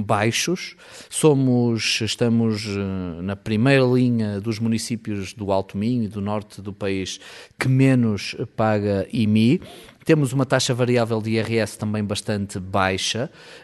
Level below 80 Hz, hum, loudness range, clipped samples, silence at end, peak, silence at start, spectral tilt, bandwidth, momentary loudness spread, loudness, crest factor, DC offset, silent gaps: -58 dBFS; none; 3 LU; under 0.1%; 0.05 s; -4 dBFS; 0 s; -5.5 dB/octave; 12 kHz; 11 LU; -21 LUFS; 18 dB; under 0.1%; none